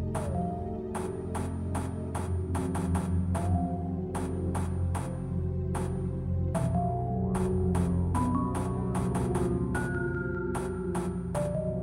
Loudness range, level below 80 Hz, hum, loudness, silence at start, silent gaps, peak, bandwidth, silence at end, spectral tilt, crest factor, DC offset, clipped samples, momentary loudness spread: 3 LU; -42 dBFS; none; -31 LUFS; 0 s; none; -16 dBFS; 13 kHz; 0 s; -8 dB/octave; 14 dB; under 0.1%; under 0.1%; 5 LU